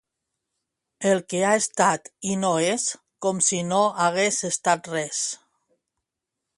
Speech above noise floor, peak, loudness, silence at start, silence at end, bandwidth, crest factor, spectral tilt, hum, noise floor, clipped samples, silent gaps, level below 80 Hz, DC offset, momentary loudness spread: 61 dB; -4 dBFS; -23 LUFS; 1 s; 1.25 s; 11.5 kHz; 20 dB; -3 dB/octave; none; -84 dBFS; under 0.1%; none; -70 dBFS; under 0.1%; 8 LU